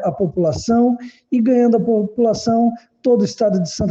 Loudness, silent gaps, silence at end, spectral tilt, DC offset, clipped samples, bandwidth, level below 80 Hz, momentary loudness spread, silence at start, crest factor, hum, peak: -17 LUFS; none; 0 s; -7 dB/octave; under 0.1%; under 0.1%; 7.8 kHz; -46 dBFS; 6 LU; 0 s; 12 dB; none; -4 dBFS